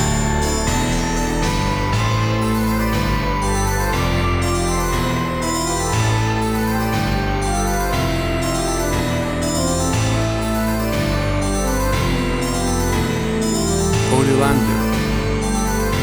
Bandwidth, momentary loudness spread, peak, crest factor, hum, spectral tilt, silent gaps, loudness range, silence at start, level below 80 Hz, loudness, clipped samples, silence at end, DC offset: over 20 kHz; 2 LU; -2 dBFS; 16 dB; none; -5 dB/octave; none; 1 LU; 0 s; -26 dBFS; -19 LUFS; under 0.1%; 0 s; under 0.1%